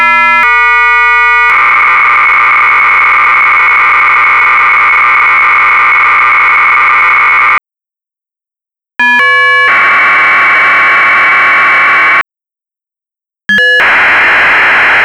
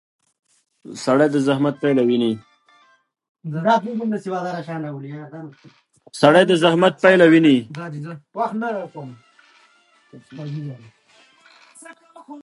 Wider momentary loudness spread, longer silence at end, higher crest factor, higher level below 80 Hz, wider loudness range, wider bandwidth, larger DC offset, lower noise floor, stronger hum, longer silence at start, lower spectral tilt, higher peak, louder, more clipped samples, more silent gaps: second, 1 LU vs 24 LU; about the same, 0 s vs 0.05 s; second, 4 dB vs 20 dB; first, -44 dBFS vs -72 dBFS; second, 3 LU vs 16 LU; first, 15.5 kHz vs 11.5 kHz; neither; first, -84 dBFS vs -57 dBFS; neither; second, 0 s vs 0.85 s; second, -2 dB/octave vs -6 dB/octave; about the same, -2 dBFS vs 0 dBFS; first, -4 LUFS vs -18 LUFS; neither; second, none vs 3.29-3.35 s